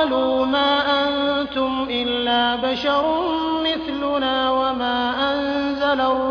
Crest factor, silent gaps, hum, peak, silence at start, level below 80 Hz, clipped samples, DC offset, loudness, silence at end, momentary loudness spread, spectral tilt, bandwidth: 12 dB; none; none; -8 dBFS; 0 s; -48 dBFS; under 0.1%; under 0.1%; -20 LUFS; 0 s; 4 LU; -5 dB/octave; 5.4 kHz